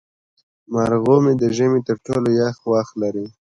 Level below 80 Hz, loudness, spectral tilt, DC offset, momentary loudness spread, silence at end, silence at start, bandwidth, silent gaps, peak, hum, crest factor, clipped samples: -54 dBFS; -19 LUFS; -7.5 dB/octave; under 0.1%; 9 LU; 0.15 s; 0.7 s; 11 kHz; none; -2 dBFS; none; 18 dB; under 0.1%